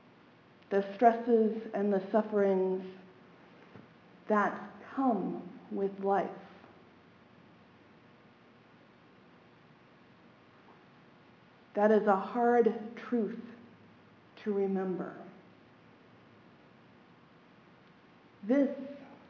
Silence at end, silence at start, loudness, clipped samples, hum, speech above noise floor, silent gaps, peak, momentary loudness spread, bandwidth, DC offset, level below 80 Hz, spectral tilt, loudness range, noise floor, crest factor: 0.15 s; 0.7 s; -31 LUFS; under 0.1%; none; 30 dB; none; -10 dBFS; 20 LU; 7 kHz; under 0.1%; -82 dBFS; -6.5 dB/octave; 9 LU; -60 dBFS; 24 dB